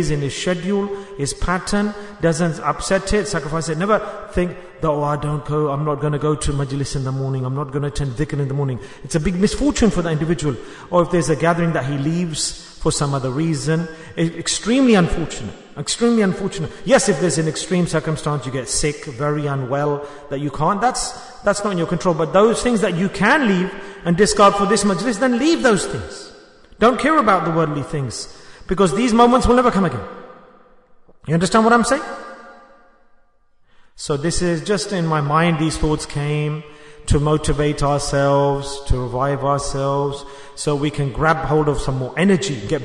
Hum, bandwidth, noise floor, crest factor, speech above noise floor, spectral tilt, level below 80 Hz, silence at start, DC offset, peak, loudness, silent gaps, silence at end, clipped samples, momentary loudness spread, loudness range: none; 11 kHz; -55 dBFS; 18 dB; 36 dB; -5 dB/octave; -34 dBFS; 0 s; under 0.1%; -2 dBFS; -19 LUFS; none; 0 s; under 0.1%; 11 LU; 5 LU